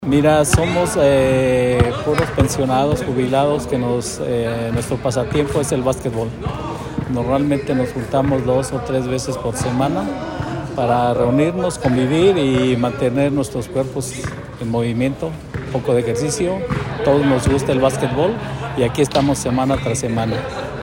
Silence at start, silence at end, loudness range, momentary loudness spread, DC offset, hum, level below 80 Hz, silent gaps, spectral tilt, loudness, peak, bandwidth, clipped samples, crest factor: 0 s; 0 s; 4 LU; 10 LU; under 0.1%; none; -36 dBFS; none; -6 dB/octave; -18 LUFS; 0 dBFS; 16.5 kHz; under 0.1%; 16 dB